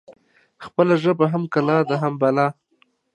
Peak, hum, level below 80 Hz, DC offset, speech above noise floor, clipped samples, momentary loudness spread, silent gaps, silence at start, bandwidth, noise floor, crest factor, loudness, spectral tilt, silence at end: -2 dBFS; none; -70 dBFS; under 0.1%; 44 dB; under 0.1%; 4 LU; none; 0.1 s; 9.6 kHz; -63 dBFS; 18 dB; -20 LUFS; -8 dB/octave; 0.6 s